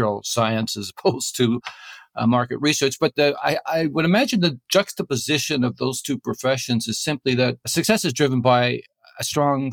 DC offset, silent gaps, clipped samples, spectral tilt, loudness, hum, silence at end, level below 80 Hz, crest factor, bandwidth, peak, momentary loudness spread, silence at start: under 0.1%; none; under 0.1%; -4.5 dB/octave; -21 LUFS; none; 0 s; -60 dBFS; 18 dB; 19 kHz; -4 dBFS; 7 LU; 0 s